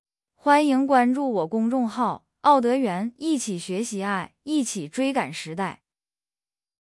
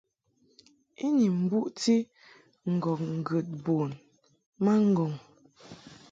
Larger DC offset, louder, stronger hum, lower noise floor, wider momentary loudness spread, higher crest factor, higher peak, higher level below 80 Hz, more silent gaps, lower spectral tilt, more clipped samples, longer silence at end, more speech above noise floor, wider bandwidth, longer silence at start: neither; first, -24 LUFS vs -28 LUFS; neither; first, under -90 dBFS vs -69 dBFS; second, 10 LU vs 18 LU; about the same, 18 dB vs 16 dB; first, -6 dBFS vs -14 dBFS; about the same, -70 dBFS vs -72 dBFS; second, none vs 4.46-4.52 s; second, -4.5 dB/octave vs -7 dB/octave; neither; first, 1.05 s vs 0.2 s; first, over 67 dB vs 42 dB; first, 12 kHz vs 9.2 kHz; second, 0.45 s vs 1 s